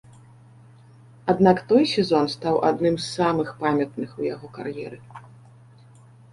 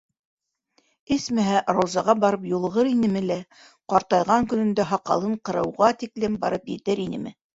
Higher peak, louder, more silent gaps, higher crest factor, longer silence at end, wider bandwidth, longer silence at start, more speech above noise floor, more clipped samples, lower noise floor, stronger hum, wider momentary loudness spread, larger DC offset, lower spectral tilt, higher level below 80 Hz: about the same, -4 dBFS vs -4 dBFS; about the same, -22 LUFS vs -23 LUFS; neither; about the same, 20 dB vs 20 dB; first, 1.1 s vs 0.25 s; first, 11.5 kHz vs 8 kHz; first, 1.25 s vs 1.1 s; second, 28 dB vs 45 dB; neither; second, -50 dBFS vs -68 dBFS; neither; first, 15 LU vs 7 LU; neither; about the same, -6 dB/octave vs -6 dB/octave; about the same, -58 dBFS vs -58 dBFS